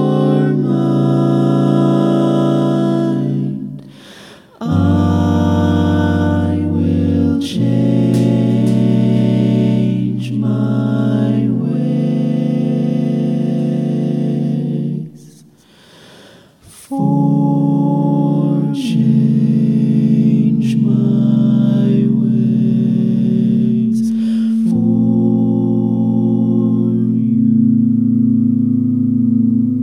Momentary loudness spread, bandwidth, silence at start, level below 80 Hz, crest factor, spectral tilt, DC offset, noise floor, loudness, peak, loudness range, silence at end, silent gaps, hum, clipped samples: 4 LU; 10.5 kHz; 0 s; -50 dBFS; 12 dB; -9 dB/octave; under 0.1%; -46 dBFS; -14 LUFS; 0 dBFS; 5 LU; 0 s; none; none; under 0.1%